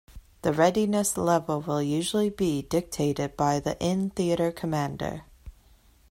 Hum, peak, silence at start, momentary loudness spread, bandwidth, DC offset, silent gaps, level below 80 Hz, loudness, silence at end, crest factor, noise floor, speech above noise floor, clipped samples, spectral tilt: none; -10 dBFS; 0.1 s; 6 LU; 16.5 kHz; under 0.1%; none; -52 dBFS; -27 LUFS; 0.6 s; 18 dB; -58 dBFS; 32 dB; under 0.1%; -5.5 dB/octave